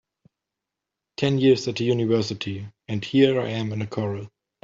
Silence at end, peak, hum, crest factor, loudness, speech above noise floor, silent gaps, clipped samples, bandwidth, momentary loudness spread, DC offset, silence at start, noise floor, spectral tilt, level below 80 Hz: 0.35 s; -6 dBFS; none; 18 dB; -23 LUFS; 63 dB; none; under 0.1%; 7.8 kHz; 14 LU; under 0.1%; 1.2 s; -85 dBFS; -6.5 dB/octave; -62 dBFS